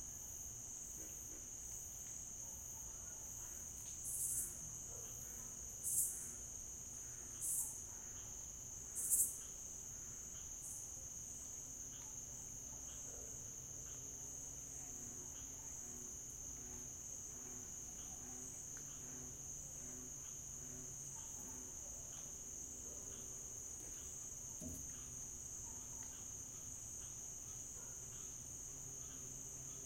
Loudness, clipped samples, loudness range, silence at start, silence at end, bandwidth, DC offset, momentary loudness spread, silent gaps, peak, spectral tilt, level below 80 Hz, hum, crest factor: -46 LUFS; under 0.1%; 6 LU; 0 s; 0 s; 16.5 kHz; under 0.1%; 8 LU; none; -22 dBFS; -2 dB/octave; -64 dBFS; none; 28 dB